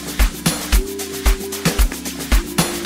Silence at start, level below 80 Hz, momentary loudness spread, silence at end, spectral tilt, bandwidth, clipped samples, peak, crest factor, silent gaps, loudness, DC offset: 0 s; -20 dBFS; 3 LU; 0 s; -3.5 dB/octave; 16.5 kHz; under 0.1%; 0 dBFS; 18 dB; none; -20 LUFS; 0.1%